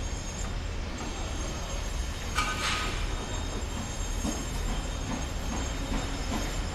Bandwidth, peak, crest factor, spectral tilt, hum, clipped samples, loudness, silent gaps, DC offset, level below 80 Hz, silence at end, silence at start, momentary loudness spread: 15 kHz; -14 dBFS; 18 dB; -3.5 dB/octave; none; under 0.1%; -33 LUFS; none; under 0.1%; -34 dBFS; 0 s; 0 s; 6 LU